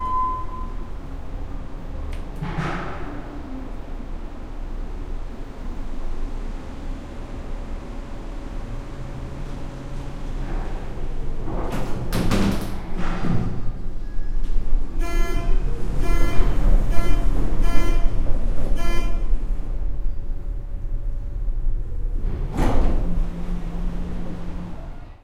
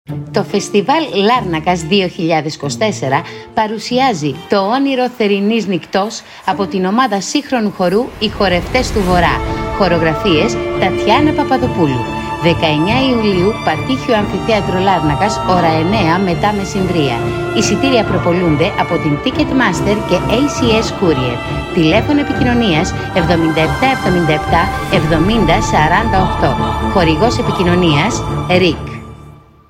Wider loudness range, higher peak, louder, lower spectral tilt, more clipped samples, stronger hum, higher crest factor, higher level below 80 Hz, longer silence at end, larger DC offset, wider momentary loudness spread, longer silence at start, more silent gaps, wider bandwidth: first, 10 LU vs 3 LU; about the same, 0 dBFS vs 0 dBFS; second, -29 LUFS vs -14 LUFS; about the same, -6.5 dB/octave vs -5.5 dB/octave; neither; neither; about the same, 18 dB vs 14 dB; first, -24 dBFS vs -30 dBFS; second, 0.1 s vs 0.35 s; neither; first, 12 LU vs 5 LU; about the same, 0 s vs 0.1 s; neither; second, 10 kHz vs 16.5 kHz